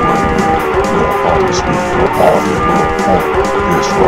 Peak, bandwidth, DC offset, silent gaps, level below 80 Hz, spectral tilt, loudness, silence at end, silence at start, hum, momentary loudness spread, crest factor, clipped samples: 0 dBFS; 16.5 kHz; 1%; none; -28 dBFS; -5.5 dB/octave; -12 LUFS; 0 s; 0 s; none; 3 LU; 12 dB; under 0.1%